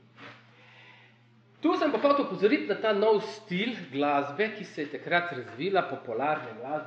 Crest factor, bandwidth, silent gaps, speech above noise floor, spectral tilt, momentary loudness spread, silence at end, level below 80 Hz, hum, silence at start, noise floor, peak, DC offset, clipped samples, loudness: 18 dB; 8 kHz; none; 32 dB; -6 dB/octave; 11 LU; 0 s; -88 dBFS; none; 0.2 s; -60 dBFS; -10 dBFS; under 0.1%; under 0.1%; -28 LUFS